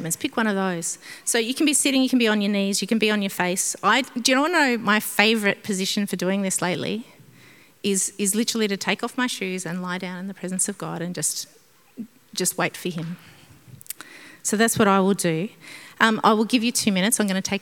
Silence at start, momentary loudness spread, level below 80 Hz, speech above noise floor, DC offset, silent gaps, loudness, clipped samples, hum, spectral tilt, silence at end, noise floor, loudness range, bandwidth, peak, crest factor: 0 s; 14 LU; -70 dBFS; 29 dB; under 0.1%; none; -22 LUFS; under 0.1%; none; -3 dB/octave; 0 s; -51 dBFS; 7 LU; 18 kHz; 0 dBFS; 24 dB